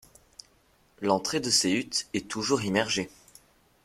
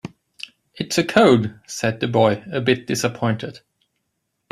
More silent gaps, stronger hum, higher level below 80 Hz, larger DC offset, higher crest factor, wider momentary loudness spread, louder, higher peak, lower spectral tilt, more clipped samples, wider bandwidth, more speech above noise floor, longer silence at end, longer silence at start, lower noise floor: neither; neither; second, -64 dBFS vs -58 dBFS; neither; about the same, 22 dB vs 18 dB; second, 9 LU vs 22 LU; second, -27 LUFS vs -19 LUFS; second, -8 dBFS vs -2 dBFS; second, -3 dB/octave vs -5 dB/octave; neither; first, 16 kHz vs 14.5 kHz; second, 37 dB vs 55 dB; second, 0.75 s vs 0.95 s; first, 1 s vs 0.05 s; second, -64 dBFS vs -75 dBFS